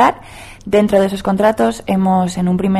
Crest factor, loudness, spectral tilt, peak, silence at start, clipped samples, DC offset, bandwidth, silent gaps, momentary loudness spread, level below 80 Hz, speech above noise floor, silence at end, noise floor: 14 dB; -15 LUFS; -6.5 dB/octave; -2 dBFS; 0 s; under 0.1%; under 0.1%; 13.5 kHz; none; 14 LU; -42 dBFS; 22 dB; 0 s; -35 dBFS